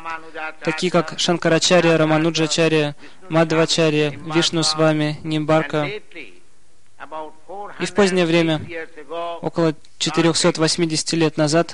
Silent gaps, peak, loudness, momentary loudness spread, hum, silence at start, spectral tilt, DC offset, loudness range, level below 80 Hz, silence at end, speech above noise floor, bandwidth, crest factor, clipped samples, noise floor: none; -4 dBFS; -18 LUFS; 16 LU; none; 0 s; -4.5 dB/octave; 1%; 5 LU; -56 dBFS; 0 s; 39 dB; 11 kHz; 16 dB; under 0.1%; -58 dBFS